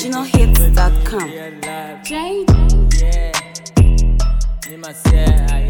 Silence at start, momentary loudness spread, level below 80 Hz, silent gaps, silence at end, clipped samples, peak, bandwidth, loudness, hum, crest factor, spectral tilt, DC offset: 0 s; 13 LU; -14 dBFS; none; 0 s; under 0.1%; 0 dBFS; 19 kHz; -16 LUFS; none; 12 dB; -5.5 dB/octave; under 0.1%